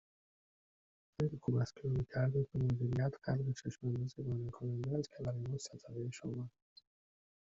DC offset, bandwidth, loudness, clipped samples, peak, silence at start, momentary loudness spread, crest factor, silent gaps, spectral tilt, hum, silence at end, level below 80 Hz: under 0.1%; 7.8 kHz; -39 LUFS; under 0.1%; -22 dBFS; 1.2 s; 9 LU; 16 dB; none; -8.5 dB/octave; none; 0.9 s; -62 dBFS